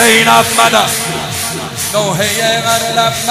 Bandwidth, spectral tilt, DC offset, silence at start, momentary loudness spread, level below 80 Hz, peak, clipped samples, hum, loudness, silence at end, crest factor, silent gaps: 16.5 kHz; -2 dB/octave; under 0.1%; 0 s; 10 LU; -44 dBFS; 0 dBFS; 0.2%; none; -11 LUFS; 0 s; 12 dB; none